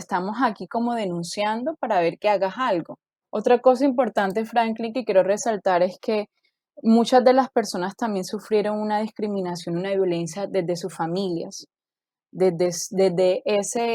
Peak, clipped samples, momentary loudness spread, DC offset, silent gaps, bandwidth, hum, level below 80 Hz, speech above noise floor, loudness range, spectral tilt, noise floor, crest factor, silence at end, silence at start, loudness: -4 dBFS; under 0.1%; 9 LU; under 0.1%; none; 16 kHz; none; -72 dBFS; over 68 dB; 5 LU; -5 dB/octave; under -90 dBFS; 18 dB; 0 s; 0 s; -23 LUFS